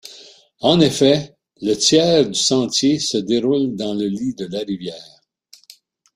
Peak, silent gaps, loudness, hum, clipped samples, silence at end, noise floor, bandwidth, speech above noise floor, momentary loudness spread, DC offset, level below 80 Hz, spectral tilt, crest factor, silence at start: -2 dBFS; none; -17 LUFS; none; under 0.1%; 1.1 s; -51 dBFS; 15 kHz; 34 dB; 13 LU; under 0.1%; -56 dBFS; -4 dB/octave; 18 dB; 0.05 s